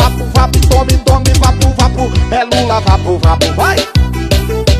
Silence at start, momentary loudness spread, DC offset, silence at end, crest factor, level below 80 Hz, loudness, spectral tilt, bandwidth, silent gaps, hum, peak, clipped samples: 0 s; 4 LU; under 0.1%; 0 s; 10 dB; -14 dBFS; -11 LUFS; -5 dB/octave; 15 kHz; none; none; 0 dBFS; under 0.1%